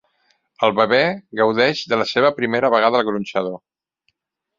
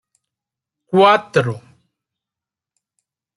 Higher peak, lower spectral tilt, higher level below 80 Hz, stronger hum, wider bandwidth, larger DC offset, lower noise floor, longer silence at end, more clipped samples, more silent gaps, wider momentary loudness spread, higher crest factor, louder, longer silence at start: about the same, -2 dBFS vs -2 dBFS; about the same, -5 dB/octave vs -6 dB/octave; about the same, -62 dBFS vs -66 dBFS; neither; second, 7.6 kHz vs 11.5 kHz; neither; second, -70 dBFS vs -88 dBFS; second, 1 s vs 1.8 s; neither; neither; second, 8 LU vs 14 LU; about the same, 18 dB vs 20 dB; second, -18 LUFS vs -15 LUFS; second, 0.6 s vs 0.9 s